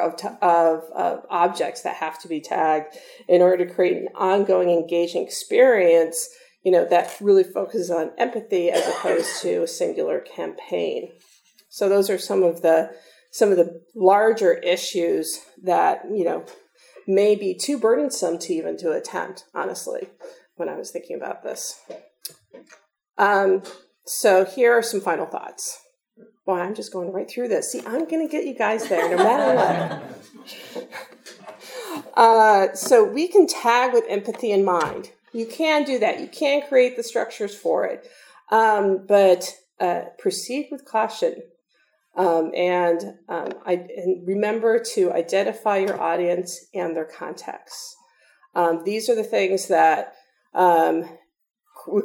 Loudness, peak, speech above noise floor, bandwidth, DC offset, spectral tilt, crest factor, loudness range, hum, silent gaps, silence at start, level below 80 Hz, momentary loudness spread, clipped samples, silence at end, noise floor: -21 LUFS; 0 dBFS; 46 dB; 18.5 kHz; under 0.1%; -4 dB/octave; 22 dB; 7 LU; none; none; 0 s; -80 dBFS; 16 LU; under 0.1%; 0 s; -66 dBFS